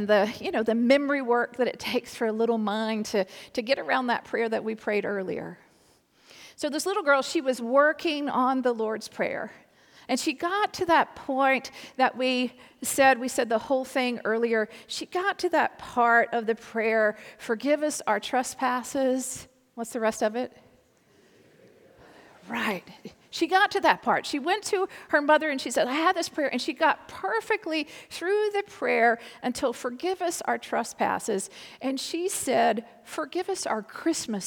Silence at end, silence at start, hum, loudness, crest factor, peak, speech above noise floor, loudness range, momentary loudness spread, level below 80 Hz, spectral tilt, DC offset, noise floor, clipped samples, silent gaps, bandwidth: 0 s; 0 s; none; -26 LUFS; 22 dB; -6 dBFS; 36 dB; 5 LU; 10 LU; -70 dBFS; -3 dB/octave; under 0.1%; -62 dBFS; under 0.1%; none; 19.5 kHz